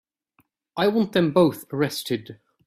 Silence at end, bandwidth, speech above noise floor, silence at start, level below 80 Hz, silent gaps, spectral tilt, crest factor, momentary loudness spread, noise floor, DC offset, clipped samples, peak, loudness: 0.35 s; 16 kHz; 45 dB; 0.75 s; -64 dBFS; none; -6 dB/octave; 18 dB; 10 LU; -67 dBFS; under 0.1%; under 0.1%; -6 dBFS; -23 LUFS